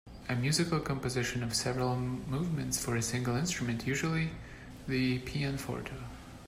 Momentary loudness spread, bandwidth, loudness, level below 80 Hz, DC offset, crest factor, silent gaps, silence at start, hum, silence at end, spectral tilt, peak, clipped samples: 9 LU; 16 kHz; -33 LUFS; -52 dBFS; under 0.1%; 18 dB; none; 0.05 s; none; 0 s; -4.5 dB/octave; -16 dBFS; under 0.1%